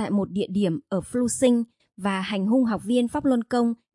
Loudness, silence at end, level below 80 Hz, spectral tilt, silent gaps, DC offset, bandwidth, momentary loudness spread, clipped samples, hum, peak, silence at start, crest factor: -24 LUFS; 0.2 s; -58 dBFS; -5.5 dB/octave; none; under 0.1%; 11.5 kHz; 6 LU; under 0.1%; none; -8 dBFS; 0 s; 16 dB